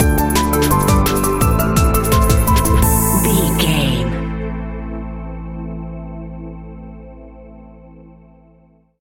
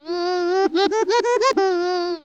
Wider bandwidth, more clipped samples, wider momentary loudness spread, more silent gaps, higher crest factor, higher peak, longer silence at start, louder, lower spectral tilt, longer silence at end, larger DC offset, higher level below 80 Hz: first, 17 kHz vs 8.4 kHz; neither; first, 18 LU vs 4 LU; neither; about the same, 16 dB vs 12 dB; first, 0 dBFS vs -8 dBFS; about the same, 0 s vs 0.05 s; first, -15 LUFS vs -20 LUFS; first, -5 dB/octave vs -2 dB/octave; first, 0.9 s vs 0.05 s; neither; first, -22 dBFS vs -62 dBFS